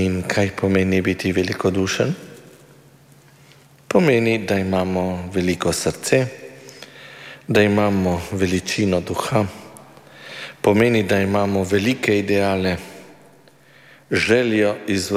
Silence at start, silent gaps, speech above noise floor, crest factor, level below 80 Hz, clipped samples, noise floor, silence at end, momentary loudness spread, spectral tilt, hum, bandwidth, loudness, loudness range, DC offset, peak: 0 s; none; 32 dB; 18 dB; -50 dBFS; under 0.1%; -50 dBFS; 0 s; 19 LU; -5.5 dB/octave; none; 16 kHz; -19 LUFS; 3 LU; under 0.1%; -2 dBFS